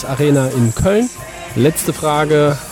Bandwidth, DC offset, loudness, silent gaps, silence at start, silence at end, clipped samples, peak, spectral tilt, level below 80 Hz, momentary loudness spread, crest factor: 17.5 kHz; under 0.1%; -15 LUFS; none; 0 s; 0 s; under 0.1%; -4 dBFS; -5.5 dB/octave; -36 dBFS; 7 LU; 12 dB